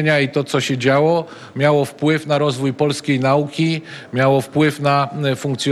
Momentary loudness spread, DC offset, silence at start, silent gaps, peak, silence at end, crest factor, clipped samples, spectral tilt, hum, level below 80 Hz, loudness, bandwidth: 5 LU; under 0.1%; 0 s; none; -2 dBFS; 0 s; 16 dB; under 0.1%; -6 dB/octave; none; -60 dBFS; -18 LUFS; 13.5 kHz